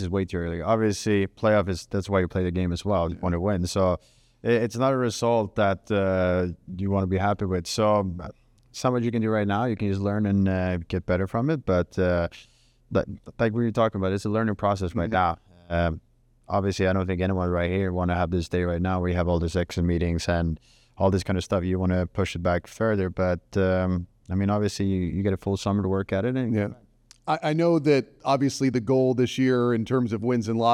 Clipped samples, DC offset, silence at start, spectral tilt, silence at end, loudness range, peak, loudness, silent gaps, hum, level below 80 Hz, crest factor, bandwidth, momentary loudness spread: under 0.1%; under 0.1%; 0 s; -7 dB/octave; 0 s; 2 LU; -8 dBFS; -25 LUFS; none; none; -50 dBFS; 16 dB; 13 kHz; 5 LU